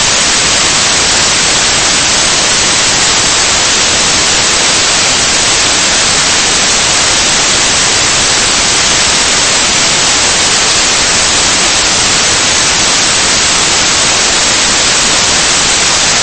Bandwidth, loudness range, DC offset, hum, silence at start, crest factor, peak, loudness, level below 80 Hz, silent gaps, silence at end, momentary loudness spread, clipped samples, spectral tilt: 11 kHz; 0 LU; under 0.1%; none; 0 s; 8 dB; 0 dBFS; -6 LUFS; -30 dBFS; none; 0 s; 0 LU; 0.4%; 0 dB/octave